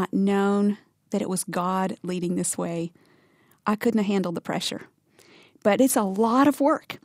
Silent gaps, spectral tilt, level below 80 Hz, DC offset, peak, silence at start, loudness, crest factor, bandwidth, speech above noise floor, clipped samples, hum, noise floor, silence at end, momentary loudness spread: none; -5 dB/octave; -68 dBFS; under 0.1%; -8 dBFS; 0 s; -24 LUFS; 18 dB; 16 kHz; 37 dB; under 0.1%; none; -61 dBFS; 0.1 s; 11 LU